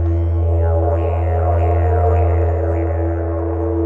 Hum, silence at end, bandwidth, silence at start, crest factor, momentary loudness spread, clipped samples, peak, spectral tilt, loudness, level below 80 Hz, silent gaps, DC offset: none; 0 s; 2.9 kHz; 0 s; 10 dB; 5 LU; under 0.1%; -6 dBFS; -11.5 dB/octave; -17 LUFS; -22 dBFS; none; under 0.1%